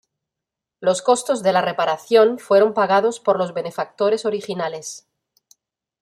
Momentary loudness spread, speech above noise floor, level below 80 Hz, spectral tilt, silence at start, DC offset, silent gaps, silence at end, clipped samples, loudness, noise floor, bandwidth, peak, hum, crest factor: 11 LU; 66 dB; -72 dBFS; -4 dB/octave; 0.8 s; under 0.1%; none; 1.05 s; under 0.1%; -19 LUFS; -85 dBFS; 13.5 kHz; -4 dBFS; none; 16 dB